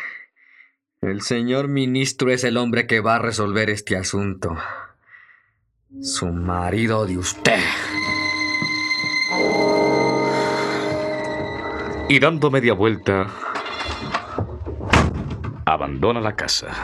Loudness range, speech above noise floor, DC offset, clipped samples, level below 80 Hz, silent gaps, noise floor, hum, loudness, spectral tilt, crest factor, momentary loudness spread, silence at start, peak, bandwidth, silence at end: 5 LU; 45 dB; under 0.1%; under 0.1%; -42 dBFS; none; -65 dBFS; none; -20 LUFS; -4.5 dB/octave; 20 dB; 10 LU; 0 s; 0 dBFS; 14 kHz; 0 s